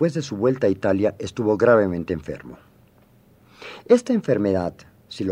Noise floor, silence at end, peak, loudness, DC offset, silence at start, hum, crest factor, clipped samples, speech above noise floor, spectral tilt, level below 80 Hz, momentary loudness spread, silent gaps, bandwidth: -55 dBFS; 0 s; -4 dBFS; -21 LUFS; under 0.1%; 0 s; none; 18 dB; under 0.1%; 34 dB; -7 dB/octave; -54 dBFS; 20 LU; none; 11 kHz